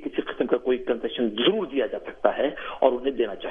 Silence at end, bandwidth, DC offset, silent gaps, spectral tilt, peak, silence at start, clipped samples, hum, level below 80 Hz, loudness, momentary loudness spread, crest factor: 0 s; 3.8 kHz; under 0.1%; none; -7.5 dB/octave; -4 dBFS; 0 s; under 0.1%; none; -56 dBFS; -25 LUFS; 5 LU; 22 dB